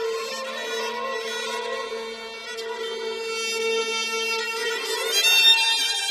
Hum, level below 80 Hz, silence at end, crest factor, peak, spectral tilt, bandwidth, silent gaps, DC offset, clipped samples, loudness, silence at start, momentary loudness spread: none; -72 dBFS; 0 s; 18 dB; -6 dBFS; 2 dB/octave; 13.5 kHz; none; under 0.1%; under 0.1%; -22 LUFS; 0 s; 17 LU